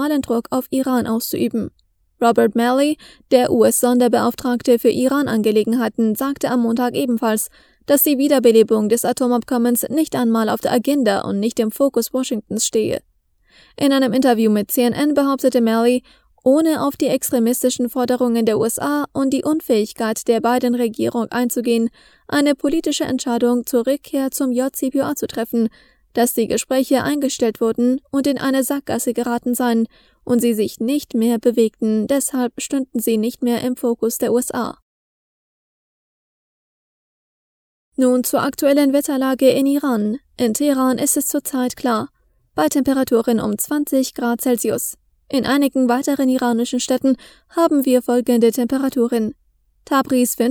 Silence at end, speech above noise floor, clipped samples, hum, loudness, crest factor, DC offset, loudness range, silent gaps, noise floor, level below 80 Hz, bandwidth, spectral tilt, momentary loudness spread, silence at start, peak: 0 s; over 73 dB; under 0.1%; none; -18 LUFS; 18 dB; under 0.1%; 4 LU; 34.82-37.92 s; under -90 dBFS; -56 dBFS; 20 kHz; -4 dB/octave; 6 LU; 0 s; 0 dBFS